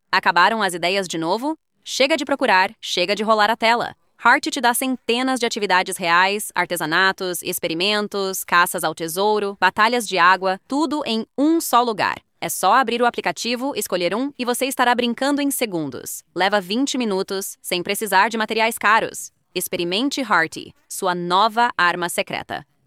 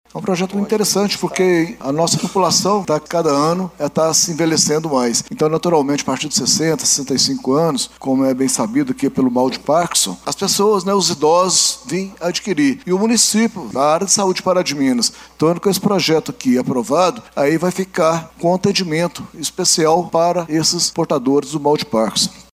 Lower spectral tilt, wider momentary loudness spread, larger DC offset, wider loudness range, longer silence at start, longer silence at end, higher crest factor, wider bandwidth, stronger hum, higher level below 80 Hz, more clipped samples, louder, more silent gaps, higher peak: about the same, -2.5 dB/octave vs -3.5 dB/octave; first, 9 LU vs 6 LU; neither; about the same, 3 LU vs 2 LU; about the same, 0.1 s vs 0.15 s; first, 0.25 s vs 0.1 s; about the same, 18 dB vs 16 dB; about the same, 16.5 kHz vs 16 kHz; neither; second, -66 dBFS vs -54 dBFS; neither; second, -19 LUFS vs -16 LUFS; neither; about the same, -2 dBFS vs 0 dBFS